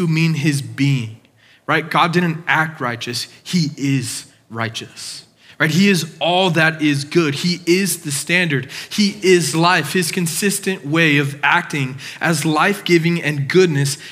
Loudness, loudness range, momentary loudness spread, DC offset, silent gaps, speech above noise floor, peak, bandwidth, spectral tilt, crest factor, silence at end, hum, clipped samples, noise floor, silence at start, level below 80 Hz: -17 LUFS; 4 LU; 10 LU; under 0.1%; none; 34 dB; 0 dBFS; 16 kHz; -4.5 dB/octave; 16 dB; 0 s; none; under 0.1%; -51 dBFS; 0 s; -72 dBFS